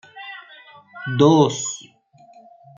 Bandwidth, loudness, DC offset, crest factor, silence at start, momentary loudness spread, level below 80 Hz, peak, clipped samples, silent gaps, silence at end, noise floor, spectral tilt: 9.6 kHz; -18 LUFS; under 0.1%; 20 dB; 0.15 s; 22 LU; -64 dBFS; -2 dBFS; under 0.1%; none; 1 s; -52 dBFS; -5.5 dB/octave